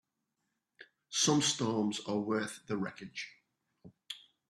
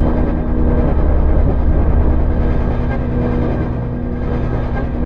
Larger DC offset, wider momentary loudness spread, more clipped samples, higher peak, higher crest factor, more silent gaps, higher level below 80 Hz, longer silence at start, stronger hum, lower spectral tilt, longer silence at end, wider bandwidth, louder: second, under 0.1% vs 1%; first, 19 LU vs 5 LU; neither; second, -16 dBFS vs -2 dBFS; first, 20 dB vs 10 dB; neither; second, -76 dBFS vs -16 dBFS; first, 0.8 s vs 0 s; second, none vs 60 Hz at -25 dBFS; second, -3.5 dB/octave vs -11 dB/octave; first, 0.35 s vs 0 s; first, 13 kHz vs 4.3 kHz; second, -33 LUFS vs -17 LUFS